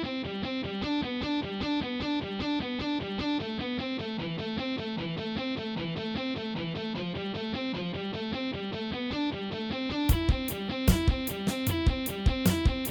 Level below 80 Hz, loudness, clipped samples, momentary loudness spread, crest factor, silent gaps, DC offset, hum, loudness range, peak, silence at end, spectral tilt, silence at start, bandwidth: -38 dBFS; -31 LUFS; under 0.1%; 7 LU; 22 dB; none; under 0.1%; none; 4 LU; -8 dBFS; 0 s; -5.5 dB/octave; 0 s; 19 kHz